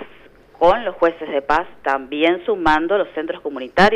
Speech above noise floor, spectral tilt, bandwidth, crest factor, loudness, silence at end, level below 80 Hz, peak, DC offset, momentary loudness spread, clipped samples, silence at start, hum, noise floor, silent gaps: 29 dB; -5.5 dB/octave; 11 kHz; 14 dB; -19 LUFS; 0 s; -44 dBFS; -4 dBFS; under 0.1%; 8 LU; under 0.1%; 0 s; none; -46 dBFS; none